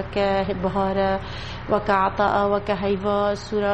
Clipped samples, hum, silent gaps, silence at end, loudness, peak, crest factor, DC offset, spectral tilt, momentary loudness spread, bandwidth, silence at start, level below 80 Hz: under 0.1%; none; none; 0 s; -22 LUFS; -6 dBFS; 16 dB; under 0.1%; -6.5 dB/octave; 5 LU; 8.6 kHz; 0 s; -40 dBFS